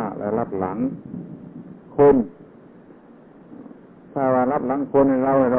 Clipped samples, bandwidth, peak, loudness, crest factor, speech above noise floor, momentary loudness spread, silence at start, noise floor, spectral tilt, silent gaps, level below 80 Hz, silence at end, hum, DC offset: under 0.1%; 3.4 kHz; -6 dBFS; -20 LUFS; 16 dB; 28 dB; 24 LU; 0 s; -47 dBFS; -12.5 dB/octave; none; -54 dBFS; 0 s; none; under 0.1%